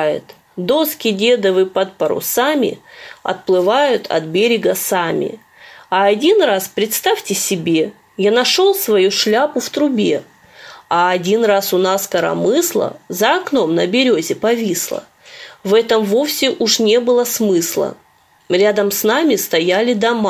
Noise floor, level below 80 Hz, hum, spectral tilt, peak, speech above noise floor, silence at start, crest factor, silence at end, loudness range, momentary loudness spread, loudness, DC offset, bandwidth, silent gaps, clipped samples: -40 dBFS; -62 dBFS; none; -3.5 dB/octave; 0 dBFS; 25 dB; 0 s; 14 dB; 0 s; 2 LU; 8 LU; -15 LUFS; under 0.1%; 16 kHz; none; under 0.1%